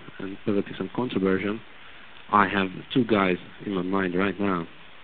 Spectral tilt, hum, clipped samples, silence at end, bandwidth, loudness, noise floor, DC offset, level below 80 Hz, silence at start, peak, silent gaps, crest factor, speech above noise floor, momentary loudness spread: -4.5 dB/octave; none; under 0.1%; 0.2 s; 4.5 kHz; -26 LUFS; -47 dBFS; 0.5%; -56 dBFS; 0 s; -4 dBFS; none; 22 dB; 22 dB; 17 LU